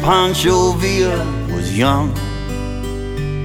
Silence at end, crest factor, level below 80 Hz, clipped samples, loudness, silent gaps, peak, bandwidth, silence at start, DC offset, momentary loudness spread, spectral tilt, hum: 0 s; 16 dB; -28 dBFS; under 0.1%; -17 LUFS; none; 0 dBFS; 18 kHz; 0 s; under 0.1%; 11 LU; -5 dB/octave; none